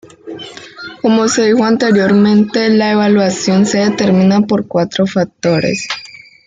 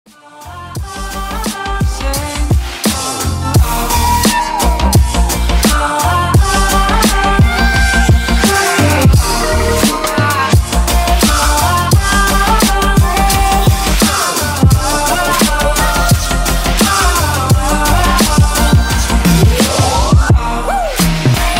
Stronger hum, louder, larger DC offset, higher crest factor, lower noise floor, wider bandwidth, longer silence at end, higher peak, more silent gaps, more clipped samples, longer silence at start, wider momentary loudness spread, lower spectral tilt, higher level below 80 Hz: neither; about the same, -12 LUFS vs -12 LUFS; neither; about the same, 10 dB vs 12 dB; about the same, -31 dBFS vs -33 dBFS; second, 9.2 kHz vs 16.5 kHz; first, 0.4 s vs 0 s; about the same, -2 dBFS vs 0 dBFS; neither; neither; about the same, 0.25 s vs 0.35 s; first, 18 LU vs 6 LU; first, -5.5 dB/octave vs -4 dB/octave; second, -54 dBFS vs -16 dBFS